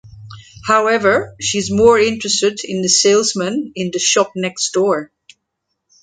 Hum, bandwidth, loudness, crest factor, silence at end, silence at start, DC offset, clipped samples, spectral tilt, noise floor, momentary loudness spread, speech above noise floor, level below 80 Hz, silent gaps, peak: none; 10 kHz; -15 LUFS; 16 dB; 1 s; 0.05 s; under 0.1%; under 0.1%; -2.5 dB/octave; -74 dBFS; 9 LU; 59 dB; -50 dBFS; none; 0 dBFS